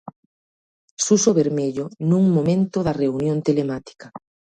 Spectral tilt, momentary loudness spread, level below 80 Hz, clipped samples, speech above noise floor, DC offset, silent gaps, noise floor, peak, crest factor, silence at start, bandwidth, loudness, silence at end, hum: -6 dB/octave; 11 LU; -54 dBFS; under 0.1%; over 70 dB; under 0.1%; 0.16-0.97 s; under -90 dBFS; -4 dBFS; 18 dB; 0.05 s; 9.4 kHz; -20 LUFS; 0.4 s; none